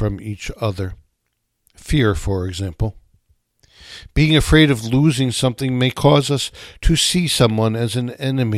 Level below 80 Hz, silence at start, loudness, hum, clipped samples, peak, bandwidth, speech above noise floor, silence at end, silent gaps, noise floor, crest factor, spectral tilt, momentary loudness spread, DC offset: -30 dBFS; 0 s; -18 LUFS; none; under 0.1%; 0 dBFS; 15 kHz; 55 dB; 0 s; none; -72 dBFS; 18 dB; -5 dB/octave; 12 LU; under 0.1%